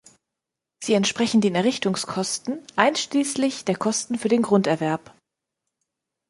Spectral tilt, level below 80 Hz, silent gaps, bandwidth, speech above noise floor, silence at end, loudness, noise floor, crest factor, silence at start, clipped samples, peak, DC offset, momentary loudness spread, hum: -4 dB/octave; -66 dBFS; none; 11.5 kHz; 63 dB; 1.3 s; -22 LUFS; -85 dBFS; 22 dB; 0.8 s; under 0.1%; -2 dBFS; under 0.1%; 7 LU; none